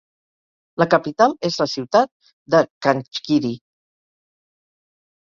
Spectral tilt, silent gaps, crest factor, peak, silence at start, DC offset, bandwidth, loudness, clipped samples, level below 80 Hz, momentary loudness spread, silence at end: -5.5 dB/octave; 2.12-2.20 s, 2.33-2.45 s, 2.70-2.81 s; 20 dB; -2 dBFS; 0.8 s; under 0.1%; 7.4 kHz; -19 LUFS; under 0.1%; -64 dBFS; 8 LU; 1.65 s